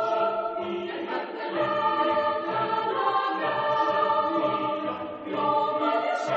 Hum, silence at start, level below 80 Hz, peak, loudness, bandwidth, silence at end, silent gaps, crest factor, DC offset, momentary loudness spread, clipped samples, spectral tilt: none; 0 s; -70 dBFS; -12 dBFS; -26 LUFS; 8 kHz; 0 s; none; 14 dB; under 0.1%; 7 LU; under 0.1%; -2.5 dB/octave